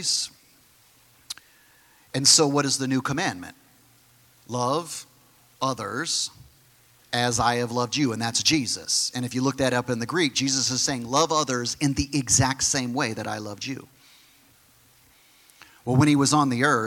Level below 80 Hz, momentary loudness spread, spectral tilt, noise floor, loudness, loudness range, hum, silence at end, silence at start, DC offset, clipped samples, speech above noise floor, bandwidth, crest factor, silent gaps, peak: -54 dBFS; 14 LU; -3 dB/octave; -58 dBFS; -23 LUFS; 7 LU; none; 0 s; 0 s; under 0.1%; under 0.1%; 34 dB; 17.5 kHz; 20 dB; none; -4 dBFS